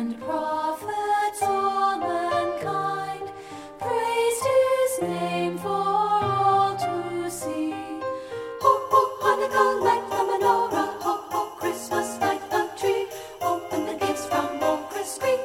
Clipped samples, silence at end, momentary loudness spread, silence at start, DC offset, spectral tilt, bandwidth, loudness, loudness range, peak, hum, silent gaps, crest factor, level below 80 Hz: under 0.1%; 0 s; 9 LU; 0 s; under 0.1%; -4 dB/octave; 17.5 kHz; -25 LUFS; 4 LU; -6 dBFS; none; none; 18 dB; -62 dBFS